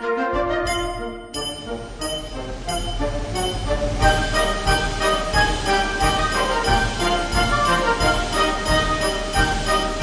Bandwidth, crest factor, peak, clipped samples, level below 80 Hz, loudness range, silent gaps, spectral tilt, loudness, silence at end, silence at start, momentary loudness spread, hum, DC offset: 10.5 kHz; 18 dB; -2 dBFS; under 0.1%; -28 dBFS; 6 LU; none; -3.5 dB/octave; -21 LUFS; 0 s; 0 s; 9 LU; none; under 0.1%